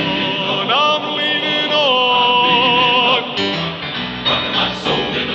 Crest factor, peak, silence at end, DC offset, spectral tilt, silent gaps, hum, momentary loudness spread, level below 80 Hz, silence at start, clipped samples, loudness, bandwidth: 14 dB; -2 dBFS; 0 s; under 0.1%; -4.5 dB/octave; none; none; 7 LU; -48 dBFS; 0 s; under 0.1%; -14 LUFS; 8.2 kHz